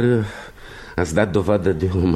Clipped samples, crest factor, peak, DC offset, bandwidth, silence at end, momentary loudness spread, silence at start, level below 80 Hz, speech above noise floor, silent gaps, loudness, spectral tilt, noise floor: under 0.1%; 16 dB; -4 dBFS; under 0.1%; 13.5 kHz; 0 s; 18 LU; 0 s; -38 dBFS; 20 dB; none; -20 LUFS; -7 dB/octave; -38 dBFS